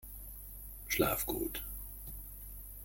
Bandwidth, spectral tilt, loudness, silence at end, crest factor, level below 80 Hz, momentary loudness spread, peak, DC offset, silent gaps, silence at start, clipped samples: 17 kHz; -3.5 dB/octave; -38 LUFS; 0 s; 24 dB; -50 dBFS; 15 LU; -16 dBFS; under 0.1%; none; 0 s; under 0.1%